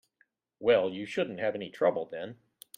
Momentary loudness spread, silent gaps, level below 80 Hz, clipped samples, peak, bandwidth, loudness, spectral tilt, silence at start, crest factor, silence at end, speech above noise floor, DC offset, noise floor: 13 LU; none; -74 dBFS; under 0.1%; -12 dBFS; 15.5 kHz; -30 LUFS; -5.5 dB/octave; 0.6 s; 20 dB; 0.45 s; 42 dB; under 0.1%; -72 dBFS